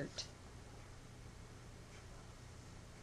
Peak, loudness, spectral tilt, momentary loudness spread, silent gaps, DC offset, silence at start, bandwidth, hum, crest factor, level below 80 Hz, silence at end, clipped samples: -30 dBFS; -55 LUFS; -4 dB/octave; 7 LU; none; under 0.1%; 0 s; 13.5 kHz; none; 22 dB; -60 dBFS; 0 s; under 0.1%